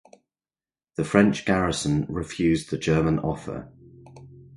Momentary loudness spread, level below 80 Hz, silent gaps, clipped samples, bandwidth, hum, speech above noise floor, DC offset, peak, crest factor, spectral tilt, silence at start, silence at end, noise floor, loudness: 13 LU; -46 dBFS; none; under 0.1%; 11.5 kHz; none; over 67 dB; under 0.1%; -2 dBFS; 22 dB; -6 dB/octave; 1 s; 0 s; under -90 dBFS; -24 LUFS